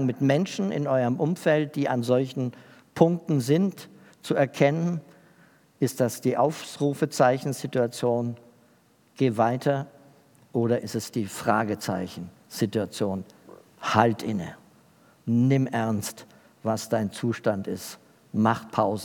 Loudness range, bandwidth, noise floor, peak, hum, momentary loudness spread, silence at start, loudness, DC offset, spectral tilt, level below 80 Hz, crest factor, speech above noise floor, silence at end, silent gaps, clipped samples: 3 LU; 19 kHz; -61 dBFS; -4 dBFS; none; 13 LU; 0 s; -26 LUFS; under 0.1%; -6.5 dB/octave; -74 dBFS; 22 dB; 36 dB; 0 s; none; under 0.1%